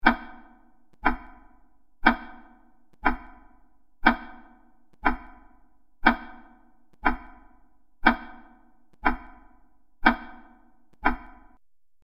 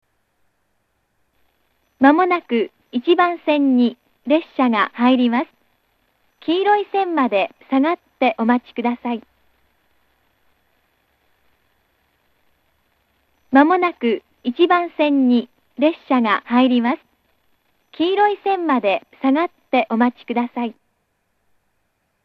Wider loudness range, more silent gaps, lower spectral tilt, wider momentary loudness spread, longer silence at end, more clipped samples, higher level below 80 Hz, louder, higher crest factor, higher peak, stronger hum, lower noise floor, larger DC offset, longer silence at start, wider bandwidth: second, 1 LU vs 5 LU; neither; about the same, -6.5 dB/octave vs -7 dB/octave; first, 16 LU vs 9 LU; second, 0.8 s vs 1.55 s; neither; first, -40 dBFS vs -70 dBFS; second, -27 LUFS vs -18 LUFS; first, 28 dB vs 20 dB; about the same, -2 dBFS vs 0 dBFS; neither; second, -65 dBFS vs -69 dBFS; neither; second, 0.05 s vs 2 s; about the same, 5.6 kHz vs 5.2 kHz